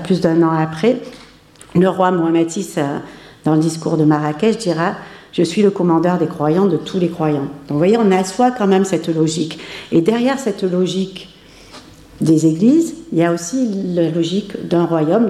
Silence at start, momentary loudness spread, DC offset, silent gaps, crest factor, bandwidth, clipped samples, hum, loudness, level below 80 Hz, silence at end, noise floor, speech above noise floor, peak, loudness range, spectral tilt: 0 s; 9 LU; under 0.1%; none; 14 dB; 13.5 kHz; under 0.1%; none; -16 LUFS; -54 dBFS; 0 s; -43 dBFS; 28 dB; -2 dBFS; 2 LU; -6.5 dB/octave